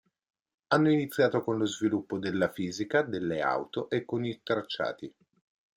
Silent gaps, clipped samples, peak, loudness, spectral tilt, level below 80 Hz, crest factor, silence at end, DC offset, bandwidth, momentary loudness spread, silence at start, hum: none; under 0.1%; -10 dBFS; -30 LUFS; -5.5 dB/octave; -70 dBFS; 20 dB; 0.7 s; under 0.1%; 16 kHz; 8 LU; 0.7 s; none